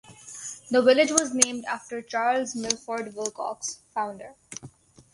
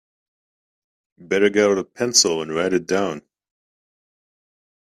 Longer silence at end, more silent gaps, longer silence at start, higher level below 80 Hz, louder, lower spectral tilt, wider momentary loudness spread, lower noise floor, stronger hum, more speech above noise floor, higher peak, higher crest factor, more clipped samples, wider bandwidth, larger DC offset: second, 0.45 s vs 1.7 s; neither; second, 0.1 s vs 1.2 s; about the same, -68 dBFS vs -64 dBFS; second, -25 LUFS vs -19 LUFS; about the same, -1.5 dB/octave vs -2.5 dB/octave; first, 21 LU vs 8 LU; second, -49 dBFS vs under -90 dBFS; neither; second, 24 dB vs over 71 dB; about the same, -2 dBFS vs 0 dBFS; about the same, 26 dB vs 22 dB; neither; second, 11.5 kHz vs 13.5 kHz; neither